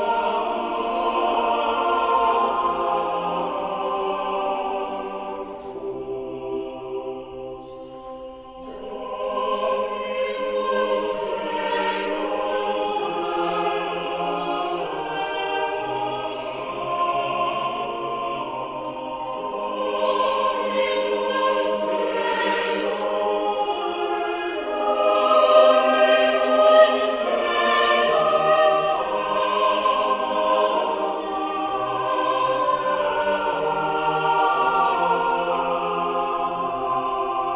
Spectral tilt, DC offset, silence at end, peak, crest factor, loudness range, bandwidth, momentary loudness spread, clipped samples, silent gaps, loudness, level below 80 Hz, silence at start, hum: -8 dB/octave; under 0.1%; 0 s; -2 dBFS; 20 dB; 11 LU; 4 kHz; 13 LU; under 0.1%; none; -22 LUFS; -56 dBFS; 0 s; none